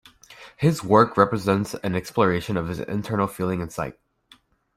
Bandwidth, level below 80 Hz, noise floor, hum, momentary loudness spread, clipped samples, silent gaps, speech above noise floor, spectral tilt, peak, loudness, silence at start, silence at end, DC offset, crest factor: 16 kHz; -54 dBFS; -57 dBFS; none; 10 LU; under 0.1%; none; 35 dB; -6.5 dB/octave; -2 dBFS; -23 LUFS; 0.3 s; 0.85 s; under 0.1%; 22 dB